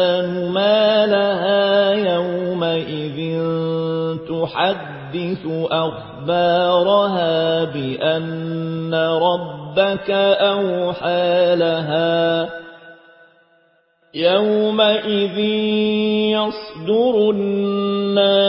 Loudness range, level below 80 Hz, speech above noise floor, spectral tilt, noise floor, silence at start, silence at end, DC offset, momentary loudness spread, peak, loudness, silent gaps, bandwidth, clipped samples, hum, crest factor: 4 LU; -60 dBFS; 41 dB; -10.5 dB/octave; -59 dBFS; 0 s; 0 s; under 0.1%; 9 LU; -2 dBFS; -18 LUFS; none; 5.8 kHz; under 0.1%; none; 16 dB